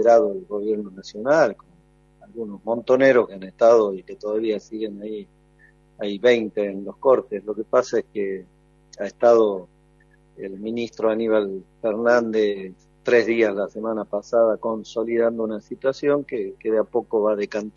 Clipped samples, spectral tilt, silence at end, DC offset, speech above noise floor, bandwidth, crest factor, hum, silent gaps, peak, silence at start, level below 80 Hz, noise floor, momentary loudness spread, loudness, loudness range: under 0.1%; -5.5 dB/octave; 0.05 s; under 0.1%; 35 dB; 7.4 kHz; 18 dB; none; none; -4 dBFS; 0 s; -60 dBFS; -56 dBFS; 15 LU; -22 LUFS; 3 LU